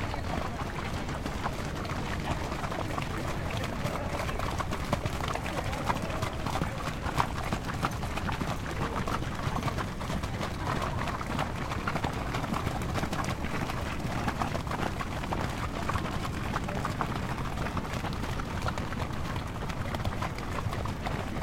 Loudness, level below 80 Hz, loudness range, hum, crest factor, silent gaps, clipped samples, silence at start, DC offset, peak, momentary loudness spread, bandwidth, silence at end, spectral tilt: -33 LUFS; -40 dBFS; 2 LU; none; 24 dB; none; under 0.1%; 0 s; under 0.1%; -8 dBFS; 3 LU; 16.5 kHz; 0 s; -5.5 dB/octave